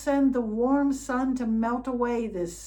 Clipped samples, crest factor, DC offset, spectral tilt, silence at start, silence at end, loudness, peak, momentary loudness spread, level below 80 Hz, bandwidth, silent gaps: under 0.1%; 12 dB; under 0.1%; -6 dB/octave; 0 s; 0 s; -26 LUFS; -12 dBFS; 4 LU; -50 dBFS; 18.5 kHz; none